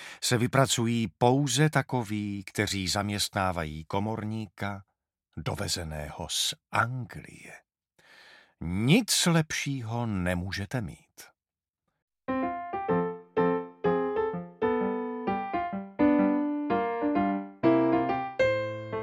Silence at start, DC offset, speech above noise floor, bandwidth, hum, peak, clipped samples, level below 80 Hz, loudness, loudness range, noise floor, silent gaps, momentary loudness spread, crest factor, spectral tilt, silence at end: 0 s; under 0.1%; over 62 dB; 16.5 kHz; none; -6 dBFS; under 0.1%; -56 dBFS; -28 LUFS; 6 LU; under -90 dBFS; 12.02-12.08 s; 12 LU; 24 dB; -4.5 dB/octave; 0 s